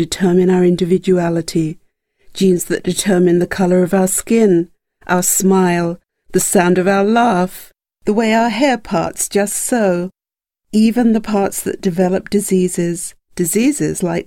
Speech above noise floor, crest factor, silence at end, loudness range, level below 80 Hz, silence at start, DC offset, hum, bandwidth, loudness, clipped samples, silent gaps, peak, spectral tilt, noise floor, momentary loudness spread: 72 dB; 14 dB; 0.05 s; 3 LU; -46 dBFS; 0 s; under 0.1%; none; 17 kHz; -15 LUFS; under 0.1%; none; 0 dBFS; -5 dB/octave; -86 dBFS; 8 LU